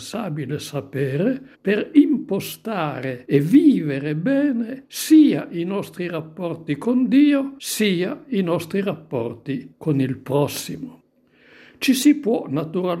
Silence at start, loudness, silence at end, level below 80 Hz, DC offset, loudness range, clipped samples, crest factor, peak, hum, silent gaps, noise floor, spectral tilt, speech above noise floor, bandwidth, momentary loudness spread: 0 s; -21 LUFS; 0 s; -66 dBFS; under 0.1%; 6 LU; under 0.1%; 18 dB; -2 dBFS; none; none; -56 dBFS; -6 dB/octave; 36 dB; 16 kHz; 13 LU